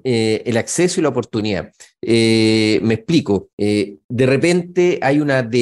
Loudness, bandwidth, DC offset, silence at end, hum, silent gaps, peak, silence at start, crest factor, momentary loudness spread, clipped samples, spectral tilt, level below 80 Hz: -17 LUFS; 12 kHz; under 0.1%; 0 s; none; 3.53-3.58 s, 4.04-4.09 s; -4 dBFS; 0.05 s; 14 dB; 7 LU; under 0.1%; -5.5 dB/octave; -54 dBFS